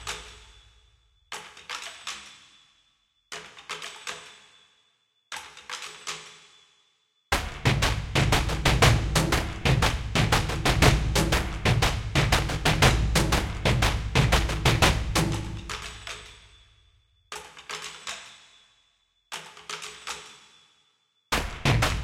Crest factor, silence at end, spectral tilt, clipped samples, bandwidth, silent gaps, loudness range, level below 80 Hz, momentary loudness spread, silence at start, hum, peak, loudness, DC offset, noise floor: 22 dB; 0 s; -4 dB/octave; under 0.1%; 16.5 kHz; none; 18 LU; -34 dBFS; 19 LU; 0 s; none; -6 dBFS; -25 LUFS; under 0.1%; -70 dBFS